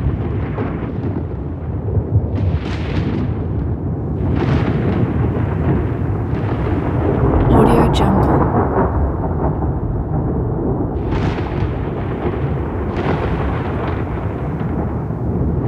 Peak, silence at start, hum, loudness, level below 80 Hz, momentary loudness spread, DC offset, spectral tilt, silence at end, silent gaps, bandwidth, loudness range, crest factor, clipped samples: 0 dBFS; 0 s; none; -18 LUFS; -26 dBFS; 8 LU; under 0.1%; -9 dB/octave; 0 s; none; 12 kHz; 5 LU; 16 dB; under 0.1%